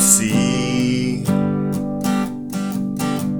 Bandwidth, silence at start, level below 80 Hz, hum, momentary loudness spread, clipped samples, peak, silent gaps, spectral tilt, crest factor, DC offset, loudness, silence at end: over 20 kHz; 0 s; -46 dBFS; none; 8 LU; under 0.1%; 0 dBFS; none; -4.5 dB/octave; 18 dB; under 0.1%; -19 LUFS; 0 s